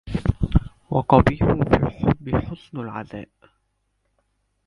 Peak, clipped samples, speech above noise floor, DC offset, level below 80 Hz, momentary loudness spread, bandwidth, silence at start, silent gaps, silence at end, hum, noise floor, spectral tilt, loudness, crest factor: 0 dBFS; under 0.1%; 51 dB; under 0.1%; -32 dBFS; 17 LU; 11 kHz; 0.05 s; none; 1.45 s; none; -71 dBFS; -9.5 dB/octave; -21 LUFS; 22 dB